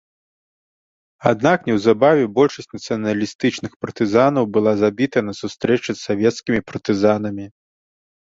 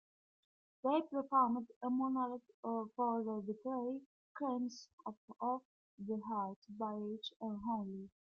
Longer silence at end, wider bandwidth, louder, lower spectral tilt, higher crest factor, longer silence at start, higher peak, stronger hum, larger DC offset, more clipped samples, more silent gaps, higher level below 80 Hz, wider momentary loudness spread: first, 0.8 s vs 0.2 s; first, 7.8 kHz vs 7 kHz; first, -19 LUFS vs -40 LUFS; about the same, -6 dB/octave vs -6.5 dB/octave; about the same, 18 dB vs 20 dB; first, 1.2 s vs 0.85 s; first, -2 dBFS vs -20 dBFS; neither; neither; neither; second, 3.35-3.39 s, 3.76-3.80 s vs 1.76-1.81 s, 2.54-2.63 s, 4.06-4.35 s, 4.93-4.98 s, 5.17-5.28 s, 5.65-5.98 s, 6.56-6.62 s, 7.36-7.40 s; first, -54 dBFS vs -82 dBFS; about the same, 12 LU vs 11 LU